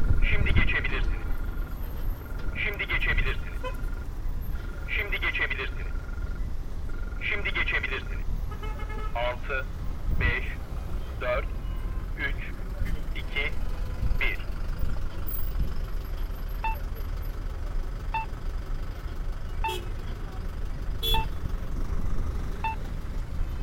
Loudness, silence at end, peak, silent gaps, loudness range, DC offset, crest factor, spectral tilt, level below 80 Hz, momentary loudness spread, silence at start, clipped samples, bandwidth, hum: -32 LUFS; 0 s; -6 dBFS; none; 5 LU; under 0.1%; 22 dB; -5.5 dB/octave; -30 dBFS; 11 LU; 0 s; under 0.1%; 16.5 kHz; none